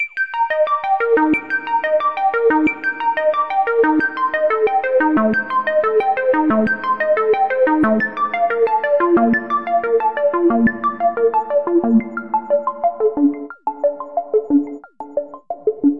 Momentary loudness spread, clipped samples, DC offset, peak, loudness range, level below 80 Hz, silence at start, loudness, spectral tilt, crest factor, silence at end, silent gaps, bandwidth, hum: 6 LU; under 0.1%; 0.4%; -4 dBFS; 3 LU; -54 dBFS; 0 s; -17 LUFS; -8 dB/octave; 12 dB; 0 s; none; 5.6 kHz; none